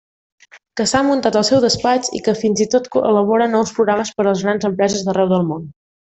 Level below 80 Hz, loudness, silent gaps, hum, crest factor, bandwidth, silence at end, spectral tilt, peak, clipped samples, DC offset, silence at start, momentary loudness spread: -54 dBFS; -16 LUFS; none; none; 14 dB; 8.4 kHz; 0.35 s; -4.5 dB/octave; -2 dBFS; under 0.1%; under 0.1%; 0.55 s; 5 LU